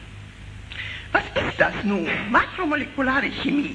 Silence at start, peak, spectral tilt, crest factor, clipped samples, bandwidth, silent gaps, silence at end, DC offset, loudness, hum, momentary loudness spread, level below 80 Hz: 0 s; -4 dBFS; -6 dB/octave; 20 dB; under 0.1%; 10.5 kHz; none; 0 s; under 0.1%; -23 LUFS; 50 Hz at -45 dBFS; 19 LU; -44 dBFS